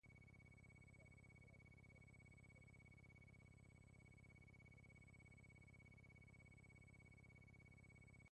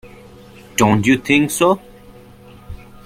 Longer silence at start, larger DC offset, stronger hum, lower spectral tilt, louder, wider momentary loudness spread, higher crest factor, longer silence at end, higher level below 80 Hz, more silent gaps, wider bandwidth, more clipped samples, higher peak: about the same, 0.05 s vs 0.05 s; neither; first, 50 Hz at -75 dBFS vs none; about the same, -6 dB/octave vs -5 dB/octave; second, -67 LUFS vs -15 LUFS; second, 1 LU vs 11 LU; second, 12 dB vs 18 dB; second, 0 s vs 0.3 s; second, -74 dBFS vs -46 dBFS; neither; second, 9.6 kHz vs 16.5 kHz; neither; second, -56 dBFS vs 0 dBFS